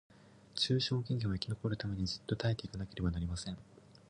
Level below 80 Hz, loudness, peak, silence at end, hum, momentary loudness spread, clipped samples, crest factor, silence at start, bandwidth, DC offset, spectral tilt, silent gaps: -52 dBFS; -37 LUFS; -16 dBFS; 0.2 s; none; 11 LU; under 0.1%; 20 dB; 0.55 s; 11 kHz; under 0.1%; -5.5 dB/octave; none